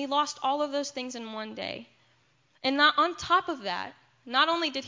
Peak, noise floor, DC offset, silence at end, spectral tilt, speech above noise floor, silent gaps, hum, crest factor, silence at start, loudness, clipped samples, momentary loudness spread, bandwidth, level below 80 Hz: -8 dBFS; -67 dBFS; under 0.1%; 0 s; -2 dB/octave; 39 dB; none; none; 22 dB; 0 s; -28 LUFS; under 0.1%; 15 LU; 7.6 kHz; -66 dBFS